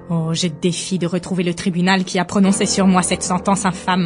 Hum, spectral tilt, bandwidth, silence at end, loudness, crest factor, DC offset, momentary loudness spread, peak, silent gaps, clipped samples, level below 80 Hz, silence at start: none; -4.5 dB/octave; 11 kHz; 0 s; -18 LUFS; 16 dB; under 0.1%; 6 LU; -2 dBFS; none; under 0.1%; -46 dBFS; 0 s